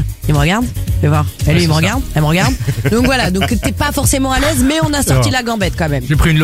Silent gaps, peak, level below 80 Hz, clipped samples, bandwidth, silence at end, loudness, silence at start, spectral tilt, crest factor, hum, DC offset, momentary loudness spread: none; 0 dBFS; -22 dBFS; under 0.1%; 16.5 kHz; 0 s; -14 LUFS; 0 s; -5 dB/octave; 12 dB; none; under 0.1%; 4 LU